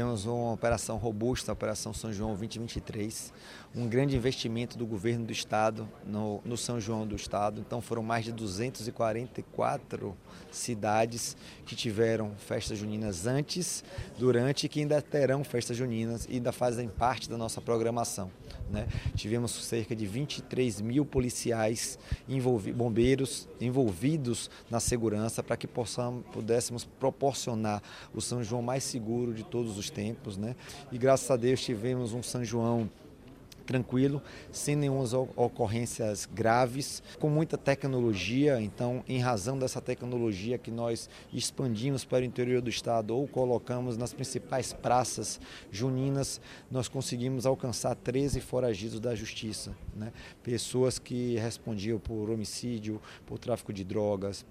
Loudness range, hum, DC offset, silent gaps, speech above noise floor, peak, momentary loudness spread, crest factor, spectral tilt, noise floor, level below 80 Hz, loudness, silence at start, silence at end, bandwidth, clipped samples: 4 LU; none; under 0.1%; none; 20 dB; -12 dBFS; 9 LU; 20 dB; -5 dB/octave; -51 dBFS; -52 dBFS; -32 LUFS; 0 s; 0 s; 15.5 kHz; under 0.1%